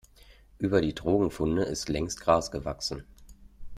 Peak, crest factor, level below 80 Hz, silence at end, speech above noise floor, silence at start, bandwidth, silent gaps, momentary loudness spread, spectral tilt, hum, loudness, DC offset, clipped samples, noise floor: -8 dBFS; 20 dB; -46 dBFS; 0 s; 28 dB; 0.3 s; 15.5 kHz; none; 8 LU; -5 dB/octave; none; -28 LUFS; under 0.1%; under 0.1%; -55 dBFS